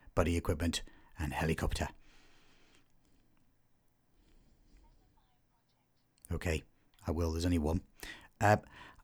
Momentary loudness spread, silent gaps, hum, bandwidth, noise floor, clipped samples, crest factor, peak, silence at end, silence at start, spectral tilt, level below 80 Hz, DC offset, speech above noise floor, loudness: 15 LU; none; none; 17.5 kHz; -75 dBFS; under 0.1%; 24 dB; -14 dBFS; 0.1 s; 0.15 s; -5.5 dB/octave; -48 dBFS; under 0.1%; 41 dB; -35 LUFS